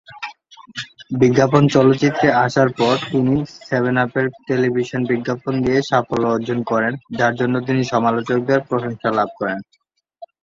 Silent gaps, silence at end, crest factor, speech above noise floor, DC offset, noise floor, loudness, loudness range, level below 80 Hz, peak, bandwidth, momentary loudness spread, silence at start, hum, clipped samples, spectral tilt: none; 0.15 s; 18 dB; 25 dB; under 0.1%; -43 dBFS; -18 LUFS; 3 LU; -52 dBFS; 0 dBFS; 7.6 kHz; 11 LU; 0.1 s; none; under 0.1%; -6.5 dB/octave